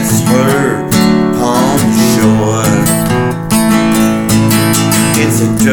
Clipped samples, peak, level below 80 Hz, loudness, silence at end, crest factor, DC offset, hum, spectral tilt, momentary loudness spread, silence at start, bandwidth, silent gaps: under 0.1%; 0 dBFS; -34 dBFS; -10 LUFS; 0 s; 10 dB; under 0.1%; none; -5 dB/octave; 2 LU; 0 s; over 20 kHz; none